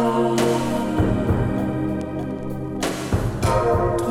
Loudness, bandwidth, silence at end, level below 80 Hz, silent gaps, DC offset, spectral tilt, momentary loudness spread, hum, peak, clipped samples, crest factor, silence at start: -22 LUFS; 16 kHz; 0 s; -34 dBFS; none; under 0.1%; -6.5 dB/octave; 8 LU; none; -6 dBFS; under 0.1%; 14 dB; 0 s